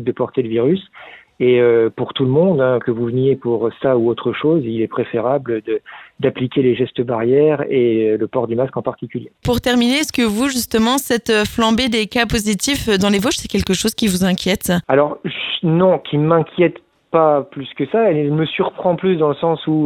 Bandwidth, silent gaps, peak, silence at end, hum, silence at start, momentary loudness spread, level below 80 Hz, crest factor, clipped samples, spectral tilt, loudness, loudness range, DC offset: 18.5 kHz; none; -2 dBFS; 0 s; none; 0 s; 6 LU; -42 dBFS; 16 dB; under 0.1%; -5 dB/octave; -17 LUFS; 2 LU; under 0.1%